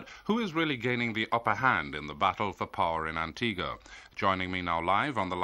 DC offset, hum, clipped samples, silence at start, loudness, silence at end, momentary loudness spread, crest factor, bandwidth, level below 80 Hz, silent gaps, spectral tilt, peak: under 0.1%; none; under 0.1%; 0 s; -30 LUFS; 0 s; 7 LU; 20 dB; 13 kHz; -56 dBFS; none; -5.5 dB/octave; -10 dBFS